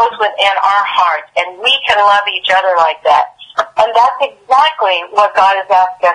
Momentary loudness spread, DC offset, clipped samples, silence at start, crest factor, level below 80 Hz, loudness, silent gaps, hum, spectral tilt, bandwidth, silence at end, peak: 5 LU; under 0.1%; under 0.1%; 0 s; 12 dB; -56 dBFS; -11 LUFS; none; none; -0.5 dB/octave; 11 kHz; 0 s; 0 dBFS